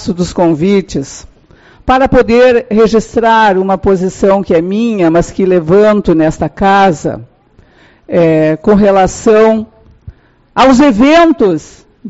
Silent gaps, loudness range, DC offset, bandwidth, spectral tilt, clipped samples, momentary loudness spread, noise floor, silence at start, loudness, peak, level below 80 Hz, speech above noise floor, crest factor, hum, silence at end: none; 2 LU; 0.2%; 8.2 kHz; -6 dB/octave; under 0.1%; 10 LU; -45 dBFS; 0 s; -9 LUFS; 0 dBFS; -32 dBFS; 36 dB; 10 dB; none; 0 s